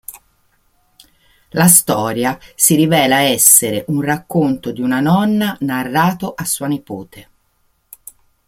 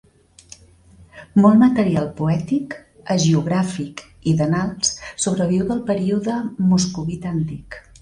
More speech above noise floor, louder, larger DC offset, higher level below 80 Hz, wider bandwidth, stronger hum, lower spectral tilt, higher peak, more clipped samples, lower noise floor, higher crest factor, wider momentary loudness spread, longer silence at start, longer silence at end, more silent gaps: first, 46 dB vs 30 dB; first, -14 LUFS vs -19 LUFS; neither; about the same, -52 dBFS vs -48 dBFS; first, 17 kHz vs 11 kHz; neither; second, -3.5 dB/octave vs -5.5 dB/octave; about the same, 0 dBFS vs -2 dBFS; neither; first, -61 dBFS vs -48 dBFS; about the same, 16 dB vs 18 dB; about the same, 13 LU vs 13 LU; second, 0.1 s vs 1 s; first, 1.25 s vs 0.25 s; neither